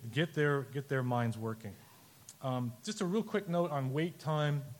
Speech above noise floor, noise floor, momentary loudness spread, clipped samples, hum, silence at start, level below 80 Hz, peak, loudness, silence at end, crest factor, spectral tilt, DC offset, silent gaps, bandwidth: 23 dB; -57 dBFS; 13 LU; under 0.1%; none; 0 s; -76 dBFS; -18 dBFS; -35 LUFS; 0 s; 16 dB; -6.5 dB/octave; under 0.1%; none; 17.5 kHz